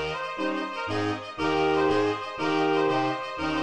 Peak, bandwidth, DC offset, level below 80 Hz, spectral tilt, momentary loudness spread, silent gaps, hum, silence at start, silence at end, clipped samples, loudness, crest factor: -12 dBFS; 9.8 kHz; 0.3%; -54 dBFS; -5.5 dB/octave; 7 LU; none; none; 0 s; 0 s; under 0.1%; -26 LUFS; 14 dB